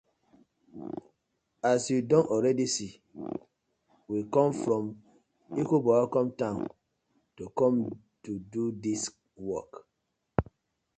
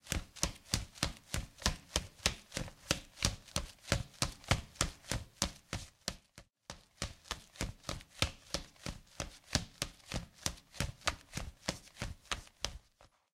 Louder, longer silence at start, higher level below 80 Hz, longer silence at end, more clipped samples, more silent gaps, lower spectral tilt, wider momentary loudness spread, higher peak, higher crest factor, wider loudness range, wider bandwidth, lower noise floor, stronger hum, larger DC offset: first, -29 LUFS vs -39 LUFS; first, 0.75 s vs 0.05 s; second, -56 dBFS vs -48 dBFS; first, 0.55 s vs 0.3 s; neither; neither; first, -5.5 dB/octave vs -2.5 dB/octave; first, 17 LU vs 10 LU; about the same, -6 dBFS vs -8 dBFS; second, 24 dB vs 34 dB; about the same, 4 LU vs 5 LU; second, 9.4 kHz vs 16.5 kHz; first, -81 dBFS vs -67 dBFS; neither; neither